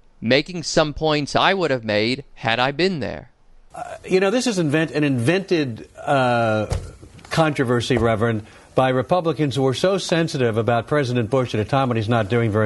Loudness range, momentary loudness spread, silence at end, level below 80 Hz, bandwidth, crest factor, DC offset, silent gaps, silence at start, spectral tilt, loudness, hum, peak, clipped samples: 2 LU; 8 LU; 0 s; -44 dBFS; 11.5 kHz; 18 dB; under 0.1%; none; 0.2 s; -5.5 dB/octave; -20 LUFS; none; -4 dBFS; under 0.1%